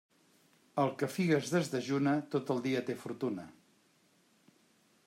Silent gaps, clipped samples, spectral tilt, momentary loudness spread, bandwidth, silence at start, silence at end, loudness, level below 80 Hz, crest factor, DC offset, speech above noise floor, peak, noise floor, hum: none; under 0.1%; -6 dB/octave; 10 LU; 16 kHz; 0.75 s; 1.55 s; -34 LUFS; -80 dBFS; 18 dB; under 0.1%; 37 dB; -18 dBFS; -69 dBFS; none